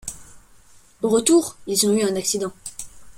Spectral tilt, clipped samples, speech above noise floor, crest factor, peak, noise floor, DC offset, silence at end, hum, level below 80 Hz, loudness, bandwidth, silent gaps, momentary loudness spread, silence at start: -3.5 dB/octave; under 0.1%; 30 dB; 20 dB; -2 dBFS; -50 dBFS; under 0.1%; 0.05 s; none; -54 dBFS; -20 LUFS; 16.5 kHz; none; 18 LU; 0.05 s